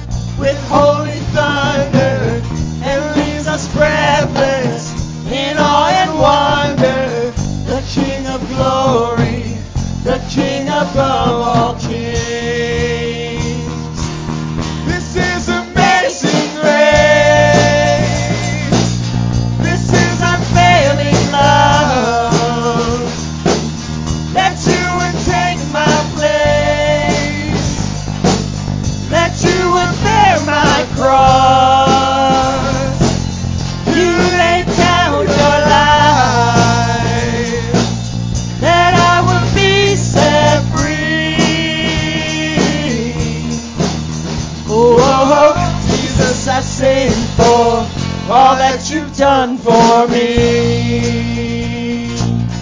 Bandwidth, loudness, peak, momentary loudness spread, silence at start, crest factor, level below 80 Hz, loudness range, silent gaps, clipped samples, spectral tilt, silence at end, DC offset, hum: 7.6 kHz; -13 LUFS; 0 dBFS; 10 LU; 0 s; 12 dB; -28 dBFS; 5 LU; none; under 0.1%; -5 dB/octave; 0 s; under 0.1%; none